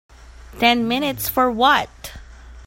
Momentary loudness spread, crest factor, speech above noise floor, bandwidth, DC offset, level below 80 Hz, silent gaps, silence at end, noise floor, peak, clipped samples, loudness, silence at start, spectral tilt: 17 LU; 20 dB; 21 dB; 16.5 kHz; under 0.1%; -42 dBFS; none; 0 s; -39 dBFS; 0 dBFS; under 0.1%; -18 LUFS; 0.3 s; -3.5 dB/octave